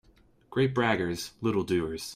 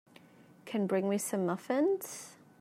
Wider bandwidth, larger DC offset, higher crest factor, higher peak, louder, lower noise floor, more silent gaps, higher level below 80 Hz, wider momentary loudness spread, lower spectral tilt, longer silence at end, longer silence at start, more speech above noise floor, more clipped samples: about the same, 16 kHz vs 16 kHz; neither; about the same, 18 dB vs 16 dB; first, -10 dBFS vs -20 dBFS; first, -29 LUFS vs -33 LUFS; about the same, -61 dBFS vs -58 dBFS; neither; first, -58 dBFS vs -84 dBFS; second, 7 LU vs 16 LU; about the same, -5.5 dB/octave vs -5.5 dB/octave; second, 0 s vs 0.25 s; second, 0.5 s vs 0.65 s; first, 33 dB vs 26 dB; neither